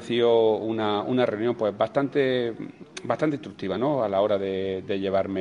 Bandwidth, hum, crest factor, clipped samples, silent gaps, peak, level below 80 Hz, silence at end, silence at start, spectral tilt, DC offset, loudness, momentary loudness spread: 10.5 kHz; none; 16 dB; under 0.1%; none; -8 dBFS; -66 dBFS; 0 s; 0 s; -6.5 dB/octave; under 0.1%; -25 LUFS; 10 LU